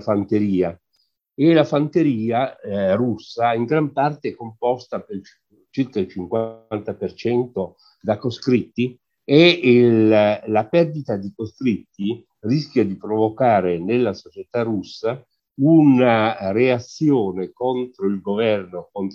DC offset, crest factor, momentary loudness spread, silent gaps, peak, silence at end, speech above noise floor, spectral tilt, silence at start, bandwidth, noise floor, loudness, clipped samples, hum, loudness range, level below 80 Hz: under 0.1%; 20 dB; 15 LU; none; 0 dBFS; 0 s; 49 dB; -7.5 dB/octave; 0 s; 7 kHz; -68 dBFS; -20 LUFS; under 0.1%; none; 8 LU; -56 dBFS